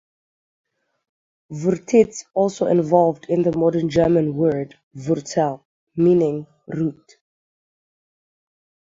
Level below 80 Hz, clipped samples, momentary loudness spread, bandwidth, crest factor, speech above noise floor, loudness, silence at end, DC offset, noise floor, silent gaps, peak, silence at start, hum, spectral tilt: -56 dBFS; under 0.1%; 15 LU; 7.8 kHz; 20 dB; over 71 dB; -20 LUFS; 2.05 s; under 0.1%; under -90 dBFS; 4.83-4.91 s, 5.65-5.87 s; -2 dBFS; 1.5 s; none; -7.5 dB/octave